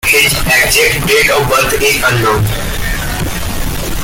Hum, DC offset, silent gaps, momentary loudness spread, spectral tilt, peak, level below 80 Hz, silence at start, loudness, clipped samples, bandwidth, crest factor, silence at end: none; under 0.1%; none; 10 LU; -3 dB/octave; 0 dBFS; -22 dBFS; 0.05 s; -11 LUFS; under 0.1%; 17 kHz; 12 dB; 0 s